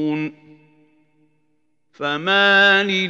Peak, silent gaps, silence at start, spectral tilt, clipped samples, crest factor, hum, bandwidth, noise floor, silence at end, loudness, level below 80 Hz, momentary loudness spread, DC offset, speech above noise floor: -2 dBFS; none; 0 s; -4.5 dB/octave; under 0.1%; 18 dB; 60 Hz at -65 dBFS; 8 kHz; -69 dBFS; 0 s; -16 LUFS; -80 dBFS; 15 LU; under 0.1%; 52 dB